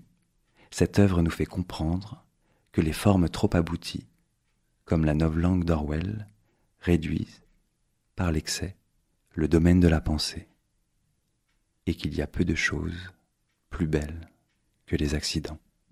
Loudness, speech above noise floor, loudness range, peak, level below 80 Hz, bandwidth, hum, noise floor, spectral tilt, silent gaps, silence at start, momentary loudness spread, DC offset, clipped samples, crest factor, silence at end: -27 LUFS; 48 dB; 5 LU; -6 dBFS; -40 dBFS; 15 kHz; none; -73 dBFS; -6 dB/octave; none; 0.7 s; 17 LU; under 0.1%; under 0.1%; 22 dB; 0.35 s